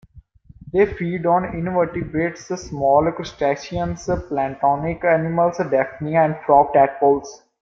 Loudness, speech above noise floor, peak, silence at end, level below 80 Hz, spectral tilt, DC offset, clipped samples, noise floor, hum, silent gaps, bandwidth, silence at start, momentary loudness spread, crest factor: -20 LUFS; 28 dB; -2 dBFS; 0.25 s; -44 dBFS; -7 dB/octave; under 0.1%; under 0.1%; -47 dBFS; none; none; 7.4 kHz; 0.15 s; 9 LU; 18 dB